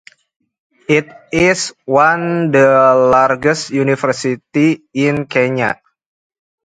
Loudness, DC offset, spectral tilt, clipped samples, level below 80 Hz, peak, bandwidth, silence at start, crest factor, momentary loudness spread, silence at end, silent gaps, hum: -14 LUFS; under 0.1%; -5.5 dB/octave; under 0.1%; -50 dBFS; 0 dBFS; 9.4 kHz; 0.9 s; 14 dB; 9 LU; 0.9 s; none; none